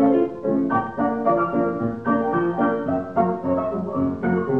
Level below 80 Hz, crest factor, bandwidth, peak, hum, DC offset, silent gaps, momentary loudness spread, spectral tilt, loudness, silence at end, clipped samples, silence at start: -54 dBFS; 14 dB; 4.1 kHz; -6 dBFS; none; 0.3%; none; 4 LU; -10 dB/octave; -22 LUFS; 0 s; under 0.1%; 0 s